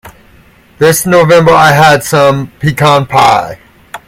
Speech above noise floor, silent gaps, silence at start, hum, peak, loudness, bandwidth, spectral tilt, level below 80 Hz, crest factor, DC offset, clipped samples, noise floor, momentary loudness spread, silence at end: 35 dB; none; 0.05 s; none; 0 dBFS; -7 LUFS; 17 kHz; -4.5 dB/octave; -40 dBFS; 8 dB; under 0.1%; 2%; -41 dBFS; 8 LU; 0.1 s